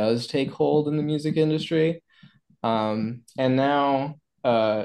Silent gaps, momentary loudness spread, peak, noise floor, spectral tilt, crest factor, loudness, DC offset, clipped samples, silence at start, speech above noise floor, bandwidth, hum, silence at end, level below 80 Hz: none; 8 LU; -8 dBFS; -55 dBFS; -7 dB/octave; 16 dB; -24 LUFS; under 0.1%; under 0.1%; 0 s; 32 dB; 12 kHz; none; 0 s; -68 dBFS